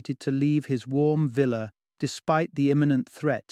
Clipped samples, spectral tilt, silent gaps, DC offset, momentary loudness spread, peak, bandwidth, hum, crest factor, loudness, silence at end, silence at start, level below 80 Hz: under 0.1%; -7.5 dB/octave; none; under 0.1%; 9 LU; -10 dBFS; 12 kHz; none; 16 dB; -26 LUFS; 0.1 s; 0.1 s; -66 dBFS